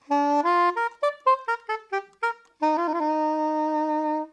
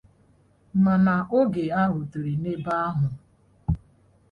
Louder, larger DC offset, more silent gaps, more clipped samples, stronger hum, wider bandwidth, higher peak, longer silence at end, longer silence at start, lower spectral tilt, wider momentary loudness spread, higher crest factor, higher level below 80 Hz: about the same, -25 LUFS vs -25 LUFS; neither; neither; neither; neither; first, 9.8 kHz vs 5 kHz; about the same, -10 dBFS vs -10 dBFS; second, 0.05 s vs 0.55 s; second, 0.1 s vs 0.75 s; second, -3 dB/octave vs -10 dB/octave; about the same, 8 LU vs 10 LU; about the same, 14 dB vs 16 dB; second, -80 dBFS vs -44 dBFS